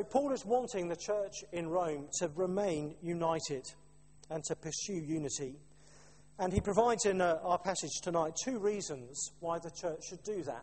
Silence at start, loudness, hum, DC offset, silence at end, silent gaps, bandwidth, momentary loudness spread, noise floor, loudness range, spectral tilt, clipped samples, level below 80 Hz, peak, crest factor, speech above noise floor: 0 s; -36 LUFS; none; under 0.1%; 0 s; none; 8.8 kHz; 10 LU; -61 dBFS; 5 LU; -4 dB/octave; under 0.1%; -60 dBFS; -16 dBFS; 20 dB; 26 dB